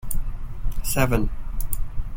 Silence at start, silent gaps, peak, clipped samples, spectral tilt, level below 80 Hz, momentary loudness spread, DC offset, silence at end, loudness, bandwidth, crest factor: 0.05 s; none; -6 dBFS; under 0.1%; -5 dB/octave; -26 dBFS; 13 LU; under 0.1%; 0 s; -28 LUFS; 17 kHz; 16 dB